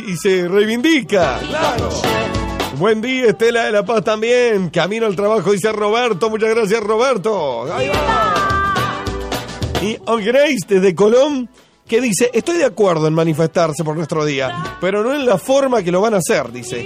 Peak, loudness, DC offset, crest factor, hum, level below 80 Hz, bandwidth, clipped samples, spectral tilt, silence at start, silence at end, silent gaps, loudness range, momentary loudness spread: -4 dBFS; -16 LUFS; under 0.1%; 12 dB; none; -38 dBFS; 15.5 kHz; under 0.1%; -5 dB/octave; 0 s; 0 s; none; 2 LU; 7 LU